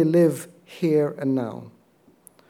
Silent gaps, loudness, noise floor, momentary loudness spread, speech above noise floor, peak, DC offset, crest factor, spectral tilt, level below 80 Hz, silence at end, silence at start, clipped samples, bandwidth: none; -23 LUFS; -58 dBFS; 18 LU; 37 dB; -8 dBFS; under 0.1%; 16 dB; -7.5 dB/octave; -78 dBFS; 0.8 s; 0 s; under 0.1%; 16.5 kHz